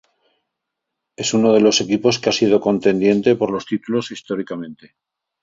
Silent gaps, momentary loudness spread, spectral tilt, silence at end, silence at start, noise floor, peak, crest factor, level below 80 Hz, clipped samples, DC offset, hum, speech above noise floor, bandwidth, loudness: none; 12 LU; -4.5 dB/octave; 0.7 s; 1.2 s; -80 dBFS; -2 dBFS; 18 dB; -58 dBFS; under 0.1%; under 0.1%; none; 63 dB; 7.8 kHz; -17 LUFS